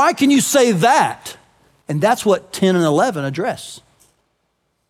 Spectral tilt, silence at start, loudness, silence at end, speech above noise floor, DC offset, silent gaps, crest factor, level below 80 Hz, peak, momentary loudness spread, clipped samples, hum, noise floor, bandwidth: -4.5 dB/octave; 0 s; -16 LUFS; 1.1 s; 52 dB; under 0.1%; none; 14 dB; -64 dBFS; -4 dBFS; 16 LU; under 0.1%; none; -68 dBFS; 16.5 kHz